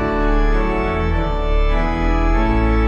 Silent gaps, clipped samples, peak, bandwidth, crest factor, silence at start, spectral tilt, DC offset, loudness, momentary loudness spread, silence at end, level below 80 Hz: none; under 0.1%; -6 dBFS; 7 kHz; 10 dB; 0 s; -8 dB/octave; under 0.1%; -19 LUFS; 3 LU; 0 s; -18 dBFS